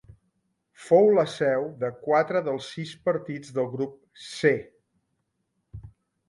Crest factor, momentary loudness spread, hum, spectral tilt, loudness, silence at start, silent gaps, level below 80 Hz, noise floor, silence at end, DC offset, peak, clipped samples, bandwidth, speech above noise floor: 20 dB; 19 LU; none; -6 dB/octave; -25 LUFS; 0.8 s; none; -62 dBFS; -77 dBFS; 0.4 s; under 0.1%; -6 dBFS; under 0.1%; 11.5 kHz; 52 dB